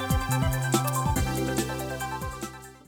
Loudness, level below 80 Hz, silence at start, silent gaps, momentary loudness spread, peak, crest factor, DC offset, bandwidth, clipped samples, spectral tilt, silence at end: -28 LUFS; -38 dBFS; 0 s; none; 10 LU; -8 dBFS; 18 dB; under 0.1%; over 20 kHz; under 0.1%; -5 dB/octave; 0.1 s